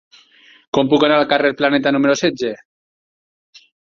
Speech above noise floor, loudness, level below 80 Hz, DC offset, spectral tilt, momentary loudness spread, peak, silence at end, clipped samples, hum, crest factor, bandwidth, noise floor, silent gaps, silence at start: 34 dB; -16 LUFS; -58 dBFS; under 0.1%; -4.5 dB/octave; 11 LU; 0 dBFS; 1.25 s; under 0.1%; none; 18 dB; 7.4 kHz; -49 dBFS; none; 0.75 s